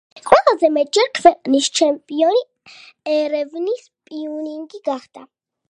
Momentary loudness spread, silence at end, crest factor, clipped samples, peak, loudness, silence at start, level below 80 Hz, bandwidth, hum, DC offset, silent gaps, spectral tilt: 16 LU; 0.45 s; 18 dB; under 0.1%; 0 dBFS; -17 LUFS; 0.15 s; -60 dBFS; 11 kHz; none; under 0.1%; none; -2 dB/octave